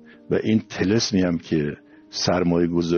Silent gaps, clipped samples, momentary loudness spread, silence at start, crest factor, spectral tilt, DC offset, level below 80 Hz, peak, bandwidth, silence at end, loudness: none; under 0.1%; 8 LU; 0.3 s; 14 dB; -5.5 dB/octave; under 0.1%; -54 dBFS; -8 dBFS; 6.8 kHz; 0 s; -22 LUFS